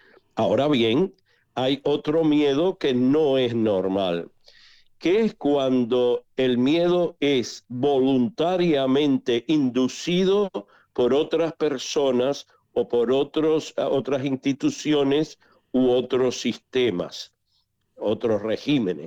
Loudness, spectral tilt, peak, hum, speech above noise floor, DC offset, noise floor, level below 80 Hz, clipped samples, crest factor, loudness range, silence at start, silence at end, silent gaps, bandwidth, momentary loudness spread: -23 LUFS; -6 dB/octave; -12 dBFS; none; 48 dB; under 0.1%; -70 dBFS; -60 dBFS; under 0.1%; 10 dB; 2 LU; 0.35 s; 0 s; none; 8.6 kHz; 8 LU